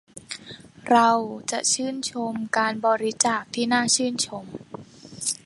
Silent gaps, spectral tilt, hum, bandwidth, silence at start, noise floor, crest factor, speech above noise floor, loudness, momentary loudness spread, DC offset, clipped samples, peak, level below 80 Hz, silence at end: none; -2 dB/octave; none; 11.5 kHz; 0.15 s; -44 dBFS; 22 dB; 21 dB; -23 LUFS; 20 LU; under 0.1%; under 0.1%; -4 dBFS; -66 dBFS; 0.1 s